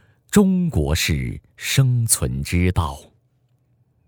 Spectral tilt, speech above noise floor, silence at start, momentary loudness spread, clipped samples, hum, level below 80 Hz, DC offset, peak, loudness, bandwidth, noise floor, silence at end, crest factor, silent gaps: -5 dB/octave; 44 dB; 0.3 s; 12 LU; under 0.1%; none; -34 dBFS; under 0.1%; -2 dBFS; -20 LUFS; over 20 kHz; -63 dBFS; 1.05 s; 18 dB; none